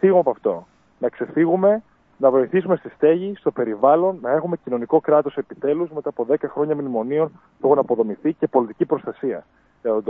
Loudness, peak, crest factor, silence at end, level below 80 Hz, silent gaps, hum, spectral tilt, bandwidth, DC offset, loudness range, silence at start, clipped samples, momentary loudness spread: -21 LUFS; -2 dBFS; 18 dB; 0 s; -68 dBFS; none; none; -11 dB/octave; 3.8 kHz; under 0.1%; 3 LU; 0 s; under 0.1%; 10 LU